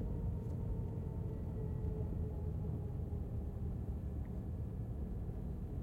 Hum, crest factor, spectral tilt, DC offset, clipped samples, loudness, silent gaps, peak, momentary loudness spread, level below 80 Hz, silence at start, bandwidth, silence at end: none; 12 dB; -10.5 dB/octave; under 0.1%; under 0.1%; -43 LUFS; none; -28 dBFS; 3 LU; -46 dBFS; 0 s; 3.6 kHz; 0 s